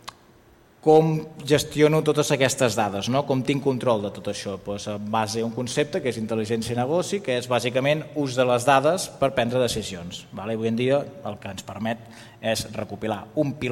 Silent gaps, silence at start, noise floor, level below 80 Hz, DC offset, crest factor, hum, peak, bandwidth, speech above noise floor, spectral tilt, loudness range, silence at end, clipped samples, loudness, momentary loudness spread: none; 0.05 s; -54 dBFS; -56 dBFS; under 0.1%; 20 dB; none; -4 dBFS; 16.5 kHz; 31 dB; -5 dB/octave; 6 LU; 0 s; under 0.1%; -24 LUFS; 12 LU